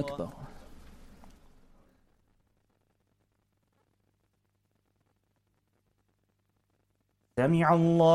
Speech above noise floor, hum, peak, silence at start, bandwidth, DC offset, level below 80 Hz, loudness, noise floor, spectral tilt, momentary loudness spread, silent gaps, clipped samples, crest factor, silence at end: 51 dB; 50 Hz at -80 dBFS; -12 dBFS; 0 s; 10.5 kHz; under 0.1%; -60 dBFS; -27 LUFS; -76 dBFS; -8 dB/octave; 24 LU; none; under 0.1%; 22 dB; 0 s